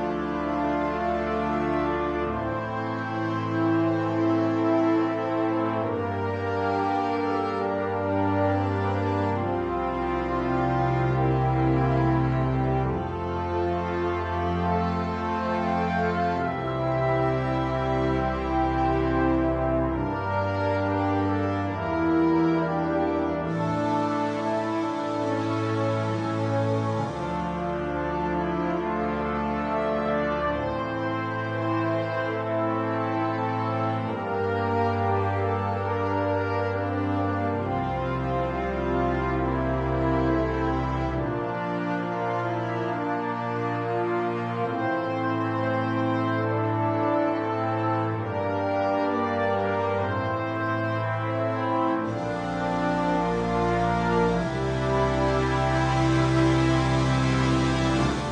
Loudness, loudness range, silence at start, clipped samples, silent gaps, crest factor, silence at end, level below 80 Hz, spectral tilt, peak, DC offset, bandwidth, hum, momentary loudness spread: -26 LUFS; 3 LU; 0 s; under 0.1%; none; 14 dB; 0 s; -42 dBFS; -7.5 dB/octave; -10 dBFS; under 0.1%; 9.8 kHz; none; 5 LU